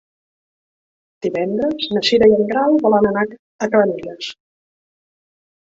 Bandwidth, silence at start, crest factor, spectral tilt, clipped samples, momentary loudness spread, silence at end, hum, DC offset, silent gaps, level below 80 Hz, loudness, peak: 7.8 kHz; 1.25 s; 16 dB; -5.5 dB/octave; under 0.1%; 14 LU; 1.3 s; none; under 0.1%; 3.39-3.59 s; -54 dBFS; -17 LUFS; -2 dBFS